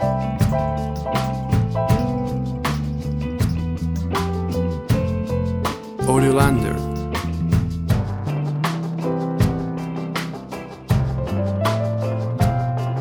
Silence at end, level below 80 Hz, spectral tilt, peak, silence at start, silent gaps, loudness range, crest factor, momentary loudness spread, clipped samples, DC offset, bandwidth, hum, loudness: 0 s; -34 dBFS; -7 dB/octave; -2 dBFS; 0 s; none; 3 LU; 18 dB; 6 LU; under 0.1%; under 0.1%; 20 kHz; none; -22 LUFS